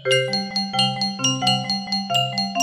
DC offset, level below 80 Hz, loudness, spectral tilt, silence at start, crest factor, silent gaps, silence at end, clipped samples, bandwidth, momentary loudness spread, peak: under 0.1%; -62 dBFS; -20 LUFS; -3 dB/octave; 0 s; 16 dB; none; 0 s; under 0.1%; 15.5 kHz; 3 LU; -6 dBFS